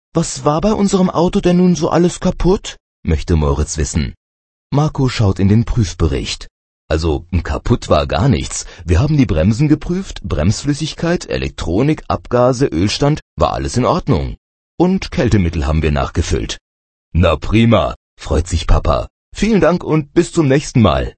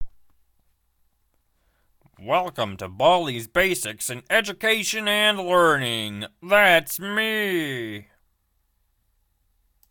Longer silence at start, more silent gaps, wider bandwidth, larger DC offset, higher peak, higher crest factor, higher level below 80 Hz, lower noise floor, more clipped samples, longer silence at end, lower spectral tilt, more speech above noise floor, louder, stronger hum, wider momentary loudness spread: first, 0.15 s vs 0 s; first, 2.80-3.03 s, 4.17-4.70 s, 6.51-6.88 s, 13.22-13.37 s, 14.38-14.78 s, 16.61-17.12 s, 17.96-18.17 s, 19.10-19.32 s vs none; second, 8.8 kHz vs 19.5 kHz; neither; first, 0 dBFS vs -4 dBFS; second, 14 dB vs 22 dB; first, -24 dBFS vs -56 dBFS; first, under -90 dBFS vs -69 dBFS; neither; second, 0.05 s vs 1.9 s; first, -6 dB/octave vs -3 dB/octave; first, over 76 dB vs 47 dB; first, -16 LUFS vs -21 LUFS; neither; second, 8 LU vs 13 LU